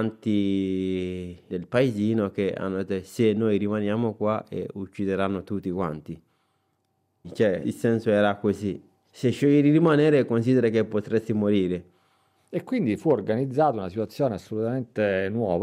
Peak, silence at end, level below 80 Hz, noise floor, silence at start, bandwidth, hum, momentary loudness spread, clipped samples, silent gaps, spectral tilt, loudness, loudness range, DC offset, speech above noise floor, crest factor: -10 dBFS; 0 s; -66 dBFS; -72 dBFS; 0 s; 14 kHz; none; 12 LU; under 0.1%; none; -8 dB/octave; -25 LUFS; 7 LU; under 0.1%; 48 dB; 14 dB